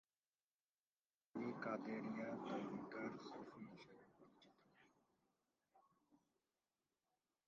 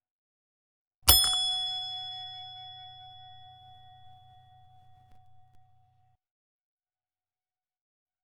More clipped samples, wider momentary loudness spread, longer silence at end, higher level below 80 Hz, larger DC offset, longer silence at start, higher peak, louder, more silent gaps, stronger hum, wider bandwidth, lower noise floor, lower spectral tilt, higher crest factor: neither; second, 13 LU vs 28 LU; second, 1.3 s vs 3.1 s; second, under -90 dBFS vs -50 dBFS; neither; first, 1.35 s vs 1.05 s; second, -34 dBFS vs 0 dBFS; second, -50 LUFS vs -25 LUFS; neither; neither; second, 7.2 kHz vs 17.5 kHz; about the same, under -90 dBFS vs under -90 dBFS; first, -5.5 dB/octave vs -0.5 dB/octave; second, 20 dB vs 34 dB